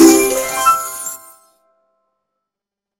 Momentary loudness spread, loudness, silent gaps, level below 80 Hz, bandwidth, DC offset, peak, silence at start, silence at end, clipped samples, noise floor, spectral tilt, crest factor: 15 LU; -15 LUFS; none; -50 dBFS; 17 kHz; under 0.1%; 0 dBFS; 0 s; 1.85 s; under 0.1%; -85 dBFS; -2 dB/octave; 16 dB